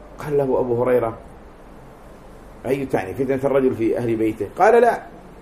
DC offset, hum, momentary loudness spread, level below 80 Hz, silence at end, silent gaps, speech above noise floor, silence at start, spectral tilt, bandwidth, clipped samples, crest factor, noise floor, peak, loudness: under 0.1%; none; 13 LU; -46 dBFS; 0 s; none; 23 dB; 0 s; -7.5 dB/octave; 15 kHz; under 0.1%; 18 dB; -42 dBFS; -2 dBFS; -20 LUFS